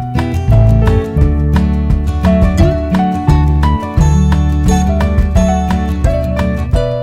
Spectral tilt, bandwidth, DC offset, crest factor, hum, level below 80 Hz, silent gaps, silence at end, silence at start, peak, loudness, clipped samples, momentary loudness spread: -7.5 dB/octave; 11.5 kHz; under 0.1%; 10 dB; none; -14 dBFS; none; 0 s; 0 s; 0 dBFS; -12 LUFS; under 0.1%; 5 LU